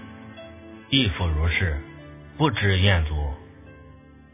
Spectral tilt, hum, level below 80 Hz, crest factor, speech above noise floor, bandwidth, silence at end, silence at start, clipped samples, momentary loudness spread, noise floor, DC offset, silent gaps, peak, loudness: -9.5 dB/octave; none; -32 dBFS; 20 dB; 26 dB; 3.8 kHz; 0.45 s; 0 s; under 0.1%; 22 LU; -48 dBFS; under 0.1%; none; -4 dBFS; -23 LUFS